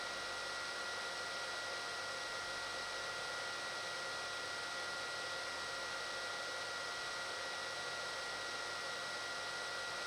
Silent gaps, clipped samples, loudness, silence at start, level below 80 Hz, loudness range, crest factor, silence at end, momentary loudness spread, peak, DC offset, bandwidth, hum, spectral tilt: none; under 0.1%; -41 LUFS; 0 s; -74 dBFS; 0 LU; 14 dB; 0 s; 0 LU; -30 dBFS; under 0.1%; over 20 kHz; none; -0.5 dB/octave